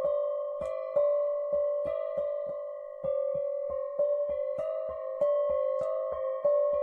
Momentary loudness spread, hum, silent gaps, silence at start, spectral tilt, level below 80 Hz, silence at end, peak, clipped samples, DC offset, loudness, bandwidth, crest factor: 7 LU; none; none; 0 s; -7 dB/octave; -64 dBFS; 0 s; -18 dBFS; under 0.1%; under 0.1%; -31 LUFS; 3.9 kHz; 14 dB